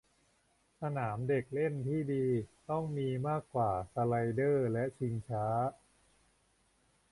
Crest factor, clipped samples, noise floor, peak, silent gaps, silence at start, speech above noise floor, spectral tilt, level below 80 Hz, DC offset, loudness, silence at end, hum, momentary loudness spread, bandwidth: 16 dB; under 0.1%; -73 dBFS; -20 dBFS; none; 0.8 s; 39 dB; -9 dB/octave; -64 dBFS; under 0.1%; -35 LUFS; 1.4 s; none; 6 LU; 11.5 kHz